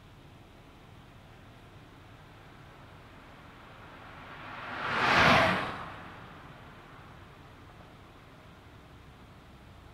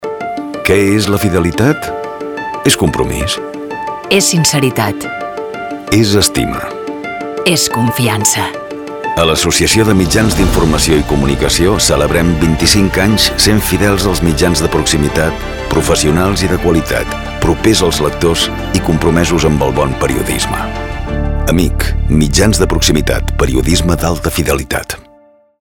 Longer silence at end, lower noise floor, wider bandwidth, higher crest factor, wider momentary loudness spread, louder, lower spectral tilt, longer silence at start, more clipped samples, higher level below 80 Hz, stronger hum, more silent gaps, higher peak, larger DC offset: second, 0.2 s vs 0.6 s; first, -53 dBFS vs -46 dBFS; second, 16 kHz vs 20 kHz; first, 26 dB vs 12 dB; first, 28 LU vs 11 LU; second, -27 LUFS vs -12 LUFS; about the same, -4.5 dB/octave vs -4 dB/octave; first, 0.95 s vs 0 s; neither; second, -58 dBFS vs -22 dBFS; neither; neither; second, -10 dBFS vs 0 dBFS; neither